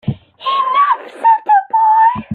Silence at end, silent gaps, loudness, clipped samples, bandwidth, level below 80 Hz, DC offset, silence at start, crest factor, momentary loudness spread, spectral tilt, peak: 0 s; none; -12 LUFS; under 0.1%; 4.6 kHz; -50 dBFS; under 0.1%; 0.05 s; 10 dB; 9 LU; -6.5 dB/octave; -2 dBFS